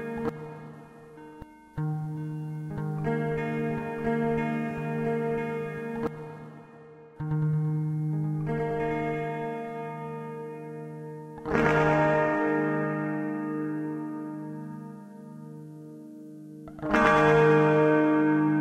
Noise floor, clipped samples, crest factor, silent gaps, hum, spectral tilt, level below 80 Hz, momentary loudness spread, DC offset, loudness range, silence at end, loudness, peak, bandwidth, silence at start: -49 dBFS; under 0.1%; 22 dB; none; none; -8 dB/octave; -54 dBFS; 23 LU; under 0.1%; 9 LU; 0 s; -27 LUFS; -6 dBFS; 8.8 kHz; 0 s